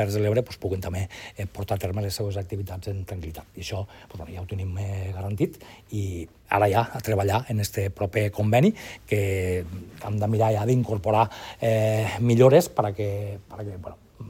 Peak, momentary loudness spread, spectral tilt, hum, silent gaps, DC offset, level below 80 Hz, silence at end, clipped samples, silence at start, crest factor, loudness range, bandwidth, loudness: -4 dBFS; 16 LU; -6.5 dB/octave; none; none; under 0.1%; -50 dBFS; 0 s; under 0.1%; 0 s; 22 dB; 10 LU; 17 kHz; -25 LUFS